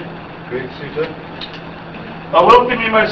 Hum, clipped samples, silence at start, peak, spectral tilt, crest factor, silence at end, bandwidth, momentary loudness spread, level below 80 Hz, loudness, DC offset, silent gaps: none; 0.2%; 0 s; 0 dBFS; -6 dB/octave; 16 dB; 0 s; 8 kHz; 21 LU; -44 dBFS; -14 LUFS; 0.2%; none